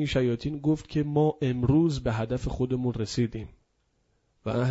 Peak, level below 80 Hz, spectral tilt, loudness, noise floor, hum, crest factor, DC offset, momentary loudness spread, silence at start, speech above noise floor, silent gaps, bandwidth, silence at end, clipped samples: -12 dBFS; -44 dBFS; -7.5 dB/octave; -27 LUFS; -71 dBFS; none; 16 dB; under 0.1%; 8 LU; 0 s; 45 dB; none; 8 kHz; 0 s; under 0.1%